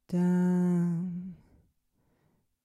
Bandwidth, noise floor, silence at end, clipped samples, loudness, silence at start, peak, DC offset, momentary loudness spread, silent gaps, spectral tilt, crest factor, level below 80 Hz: 9.2 kHz; -73 dBFS; 1.3 s; under 0.1%; -28 LUFS; 0.1 s; -18 dBFS; under 0.1%; 14 LU; none; -9.5 dB/octave; 12 dB; -70 dBFS